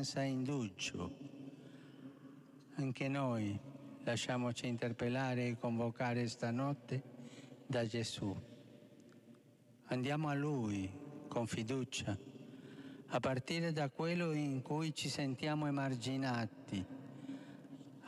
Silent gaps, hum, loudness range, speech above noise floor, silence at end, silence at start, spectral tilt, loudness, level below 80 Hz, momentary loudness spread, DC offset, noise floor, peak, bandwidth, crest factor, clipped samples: none; none; 4 LU; 26 dB; 0 s; 0 s; -5.5 dB/octave; -40 LUFS; -76 dBFS; 17 LU; under 0.1%; -65 dBFS; -26 dBFS; 12.5 kHz; 14 dB; under 0.1%